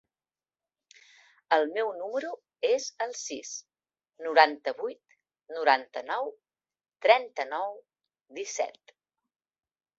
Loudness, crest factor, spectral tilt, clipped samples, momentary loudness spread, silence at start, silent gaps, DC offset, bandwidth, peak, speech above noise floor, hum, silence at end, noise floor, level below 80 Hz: -28 LUFS; 28 dB; 0 dB/octave; under 0.1%; 16 LU; 1.5 s; none; under 0.1%; 8 kHz; -4 dBFS; over 62 dB; none; 1.3 s; under -90 dBFS; -84 dBFS